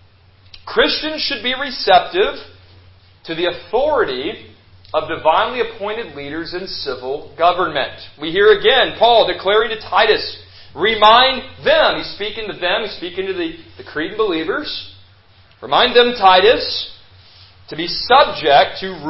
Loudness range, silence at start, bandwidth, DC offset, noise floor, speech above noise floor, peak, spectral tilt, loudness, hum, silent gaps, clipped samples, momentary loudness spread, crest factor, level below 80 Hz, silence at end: 7 LU; 0.55 s; 5.8 kHz; under 0.1%; -48 dBFS; 32 dB; 0 dBFS; -6.5 dB/octave; -15 LUFS; none; none; under 0.1%; 15 LU; 16 dB; -46 dBFS; 0 s